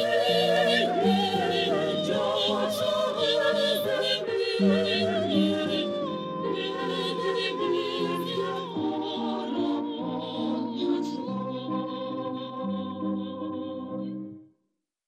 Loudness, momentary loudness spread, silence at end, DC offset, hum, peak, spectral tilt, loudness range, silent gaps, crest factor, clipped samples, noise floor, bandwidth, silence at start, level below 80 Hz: -27 LUFS; 10 LU; 0.6 s; under 0.1%; none; -10 dBFS; -5 dB/octave; 7 LU; none; 18 dB; under 0.1%; -79 dBFS; 15.5 kHz; 0 s; -70 dBFS